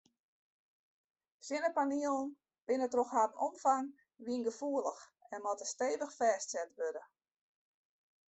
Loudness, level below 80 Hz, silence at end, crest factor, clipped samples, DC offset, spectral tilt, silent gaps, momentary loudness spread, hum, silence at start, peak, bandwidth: -36 LUFS; -84 dBFS; 1.25 s; 20 dB; under 0.1%; under 0.1%; -2.5 dB/octave; none; 14 LU; none; 1.45 s; -18 dBFS; 8.4 kHz